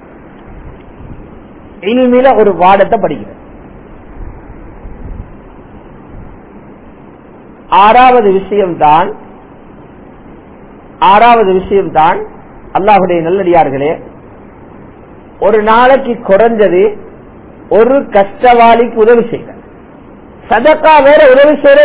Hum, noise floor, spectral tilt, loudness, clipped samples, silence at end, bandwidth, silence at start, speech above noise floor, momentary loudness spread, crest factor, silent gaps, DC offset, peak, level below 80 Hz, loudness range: none; -34 dBFS; -9.5 dB/octave; -7 LUFS; 2%; 0 s; 4 kHz; 0 s; 27 dB; 17 LU; 10 dB; none; under 0.1%; 0 dBFS; -36 dBFS; 4 LU